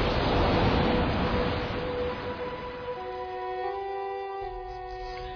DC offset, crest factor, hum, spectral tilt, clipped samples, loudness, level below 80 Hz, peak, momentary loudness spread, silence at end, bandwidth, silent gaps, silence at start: under 0.1%; 16 dB; none; -7.5 dB/octave; under 0.1%; -30 LUFS; -38 dBFS; -12 dBFS; 13 LU; 0 s; 5.4 kHz; none; 0 s